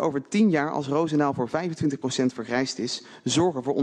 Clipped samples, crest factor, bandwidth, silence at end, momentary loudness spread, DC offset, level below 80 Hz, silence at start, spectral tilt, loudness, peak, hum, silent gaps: under 0.1%; 16 dB; 10 kHz; 0 s; 6 LU; under 0.1%; -64 dBFS; 0 s; -5 dB/octave; -25 LUFS; -8 dBFS; none; none